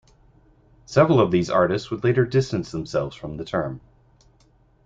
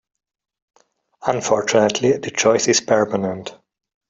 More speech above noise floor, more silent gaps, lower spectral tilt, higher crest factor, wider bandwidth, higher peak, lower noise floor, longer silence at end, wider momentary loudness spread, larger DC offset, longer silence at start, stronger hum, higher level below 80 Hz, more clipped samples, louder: first, 37 dB vs 30 dB; neither; first, -7 dB/octave vs -3.5 dB/octave; about the same, 20 dB vs 18 dB; about the same, 7.8 kHz vs 7.8 kHz; about the same, -2 dBFS vs -2 dBFS; first, -58 dBFS vs -48 dBFS; first, 1.05 s vs 0.55 s; first, 14 LU vs 10 LU; neither; second, 0.9 s vs 1.2 s; neither; first, -52 dBFS vs -60 dBFS; neither; second, -22 LUFS vs -18 LUFS